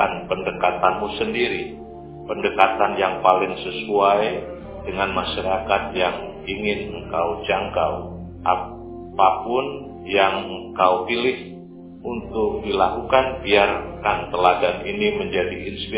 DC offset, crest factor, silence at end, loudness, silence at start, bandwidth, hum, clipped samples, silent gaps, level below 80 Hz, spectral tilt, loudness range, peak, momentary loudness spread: under 0.1%; 22 dB; 0 s; -21 LUFS; 0 s; 4 kHz; none; under 0.1%; none; -44 dBFS; -8.5 dB/octave; 3 LU; 0 dBFS; 14 LU